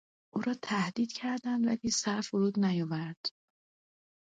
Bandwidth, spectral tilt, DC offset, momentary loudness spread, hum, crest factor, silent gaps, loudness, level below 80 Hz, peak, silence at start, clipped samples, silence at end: 9.4 kHz; -4.5 dB/octave; under 0.1%; 8 LU; none; 14 dB; 3.17-3.24 s; -32 LUFS; -72 dBFS; -18 dBFS; 0.35 s; under 0.1%; 1.05 s